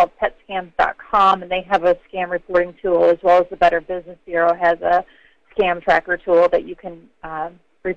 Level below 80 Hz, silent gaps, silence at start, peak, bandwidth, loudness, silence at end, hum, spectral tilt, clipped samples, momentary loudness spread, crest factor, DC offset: -46 dBFS; none; 0 s; -4 dBFS; 7.2 kHz; -18 LUFS; 0 s; none; -6 dB/octave; under 0.1%; 14 LU; 14 dB; 0.1%